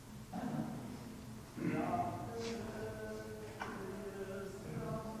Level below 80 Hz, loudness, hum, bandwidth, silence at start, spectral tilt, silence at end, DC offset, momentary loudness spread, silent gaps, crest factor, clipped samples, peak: -60 dBFS; -43 LUFS; none; 16 kHz; 0 s; -6 dB/octave; 0 s; under 0.1%; 10 LU; none; 18 dB; under 0.1%; -26 dBFS